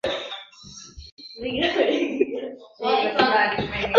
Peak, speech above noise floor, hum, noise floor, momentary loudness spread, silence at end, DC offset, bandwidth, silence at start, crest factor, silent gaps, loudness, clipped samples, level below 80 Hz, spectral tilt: 0 dBFS; 23 dB; none; -44 dBFS; 22 LU; 0 s; under 0.1%; 7.8 kHz; 0.05 s; 22 dB; 1.12-1.17 s; -23 LUFS; under 0.1%; -50 dBFS; -4.5 dB/octave